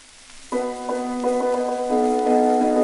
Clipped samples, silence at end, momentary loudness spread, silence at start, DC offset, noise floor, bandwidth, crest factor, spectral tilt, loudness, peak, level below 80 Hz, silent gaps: under 0.1%; 0 s; 9 LU; 0.3 s; under 0.1%; -44 dBFS; 11.5 kHz; 14 dB; -4 dB/octave; -22 LUFS; -8 dBFS; -52 dBFS; none